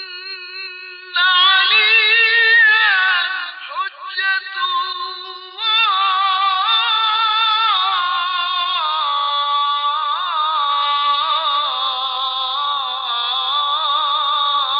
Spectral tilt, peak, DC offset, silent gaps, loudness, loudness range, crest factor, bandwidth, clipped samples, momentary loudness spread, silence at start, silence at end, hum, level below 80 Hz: -2.5 dB/octave; -4 dBFS; under 0.1%; none; -15 LUFS; 6 LU; 14 dB; 5.4 kHz; under 0.1%; 14 LU; 0 s; 0 s; none; -88 dBFS